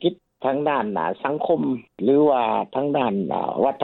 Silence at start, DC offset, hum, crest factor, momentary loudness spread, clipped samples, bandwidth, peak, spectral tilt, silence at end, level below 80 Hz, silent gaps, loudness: 0 s; under 0.1%; none; 16 dB; 7 LU; under 0.1%; 4.2 kHz; -6 dBFS; -10 dB/octave; 0 s; -64 dBFS; none; -22 LUFS